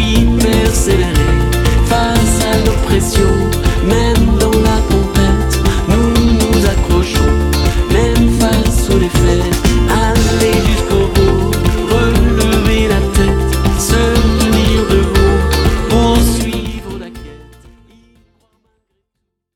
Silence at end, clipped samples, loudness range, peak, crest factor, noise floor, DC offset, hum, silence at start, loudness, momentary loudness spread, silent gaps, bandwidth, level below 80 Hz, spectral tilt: 2.15 s; under 0.1%; 2 LU; 0 dBFS; 10 dB; -72 dBFS; under 0.1%; none; 0 s; -12 LUFS; 3 LU; none; 17.5 kHz; -16 dBFS; -5.5 dB/octave